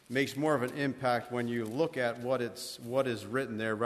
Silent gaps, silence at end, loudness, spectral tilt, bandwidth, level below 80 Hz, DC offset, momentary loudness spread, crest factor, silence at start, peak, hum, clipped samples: none; 0 s; -33 LUFS; -5.5 dB/octave; 13.5 kHz; -72 dBFS; under 0.1%; 4 LU; 16 dB; 0.1 s; -16 dBFS; none; under 0.1%